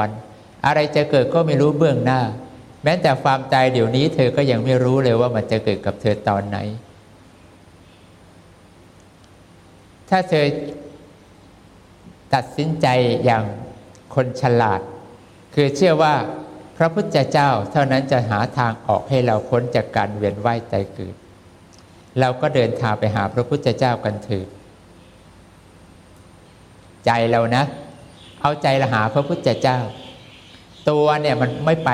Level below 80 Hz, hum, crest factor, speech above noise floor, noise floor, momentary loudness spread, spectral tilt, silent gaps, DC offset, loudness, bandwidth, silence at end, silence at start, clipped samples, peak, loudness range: -54 dBFS; none; 18 dB; 29 dB; -47 dBFS; 12 LU; -7 dB/octave; none; under 0.1%; -19 LUFS; 12 kHz; 0 s; 0 s; under 0.1%; -2 dBFS; 7 LU